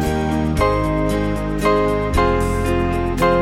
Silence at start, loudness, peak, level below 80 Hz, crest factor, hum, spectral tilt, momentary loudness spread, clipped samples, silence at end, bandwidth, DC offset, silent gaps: 0 s; -18 LUFS; -4 dBFS; -26 dBFS; 14 dB; none; -6.5 dB/octave; 3 LU; under 0.1%; 0 s; 16 kHz; under 0.1%; none